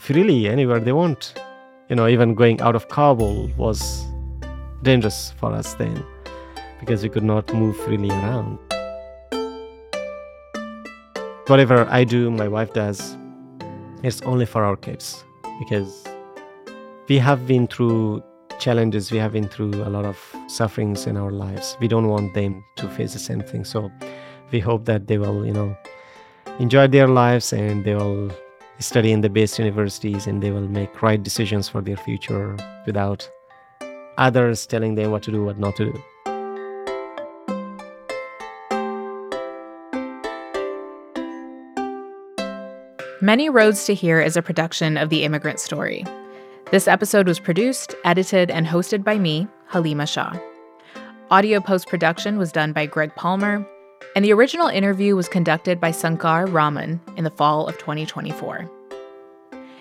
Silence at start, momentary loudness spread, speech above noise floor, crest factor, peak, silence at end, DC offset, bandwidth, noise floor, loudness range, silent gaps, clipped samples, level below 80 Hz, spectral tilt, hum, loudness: 0 s; 20 LU; 26 dB; 20 dB; -2 dBFS; 0.05 s; under 0.1%; 16 kHz; -46 dBFS; 9 LU; none; under 0.1%; -44 dBFS; -6 dB/octave; none; -20 LUFS